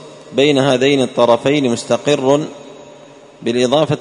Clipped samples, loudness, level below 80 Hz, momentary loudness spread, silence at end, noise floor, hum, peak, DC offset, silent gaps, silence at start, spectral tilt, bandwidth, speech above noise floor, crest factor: under 0.1%; -15 LUFS; -56 dBFS; 10 LU; 0 s; -40 dBFS; none; 0 dBFS; under 0.1%; none; 0 s; -5 dB/octave; 11 kHz; 26 dB; 14 dB